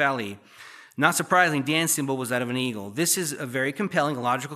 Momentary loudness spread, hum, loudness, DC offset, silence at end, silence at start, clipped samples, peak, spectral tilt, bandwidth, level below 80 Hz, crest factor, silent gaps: 11 LU; none; -24 LUFS; under 0.1%; 0 s; 0 s; under 0.1%; -2 dBFS; -3.5 dB/octave; 15 kHz; -78 dBFS; 22 dB; none